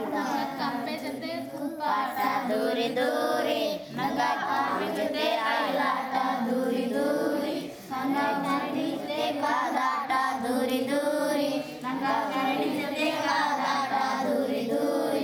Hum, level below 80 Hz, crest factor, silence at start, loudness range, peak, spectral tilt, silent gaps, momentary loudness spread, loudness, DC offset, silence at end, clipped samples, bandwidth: none; -72 dBFS; 14 dB; 0 s; 1 LU; -12 dBFS; -4 dB/octave; none; 5 LU; -28 LUFS; under 0.1%; 0 s; under 0.1%; over 20 kHz